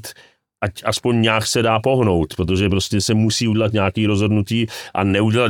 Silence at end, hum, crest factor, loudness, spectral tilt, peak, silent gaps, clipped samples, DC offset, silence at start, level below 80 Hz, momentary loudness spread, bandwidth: 0 s; none; 14 dB; -18 LUFS; -5 dB/octave; -4 dBFS; none; under 0.1%; under 0.1%; 0.05 s; -46 dBFS; 6 LU; 16.5 kHz